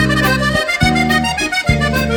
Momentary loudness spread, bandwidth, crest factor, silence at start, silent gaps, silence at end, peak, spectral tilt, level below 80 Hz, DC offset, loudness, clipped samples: 2 LU; over 20 kHz; 14 dB; 0 s; none; 0 s; 0 dBFS; -4.5 dB/octave; -26 dBFS; under 0.1%; -14 LUFS; under 0.1%